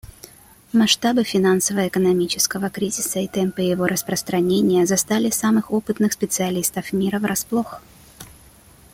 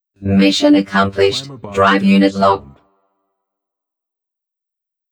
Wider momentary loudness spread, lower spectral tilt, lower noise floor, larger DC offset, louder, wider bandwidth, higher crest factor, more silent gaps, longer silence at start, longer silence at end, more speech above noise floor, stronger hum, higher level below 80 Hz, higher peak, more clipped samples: about the same, 6 LU vs 8 LU; second, -4 dB/octave vs -5.5 dB/octave; second, -48 dBFS vs -76 dBFS; neither; second, -20 LUFS vs -14 LUFS; first, 17 kHz vs 11 kHz; about the same, 18 dB vs 16 dB; neither; second, 0.05 s vs 0.2 s; second, 0.65 s vs 2.5 s; second, 29 dB vs 63 dB; neither; about the same, -54 dBFS vs -54 dBFS; about the same, -2 dBFS vs -2 dBFS; neither